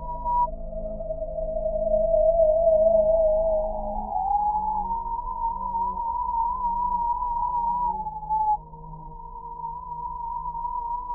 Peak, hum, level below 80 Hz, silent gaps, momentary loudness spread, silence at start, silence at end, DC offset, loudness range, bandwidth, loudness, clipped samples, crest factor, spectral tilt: -10 dBFS; none; -38 dBFS; none; 15 LU; 0 s; 0 s; under 0.1%; 7 LU; 1.4 kHz; -25 LUFS; under 0.1%; 14 dB; -9.5 dB/octave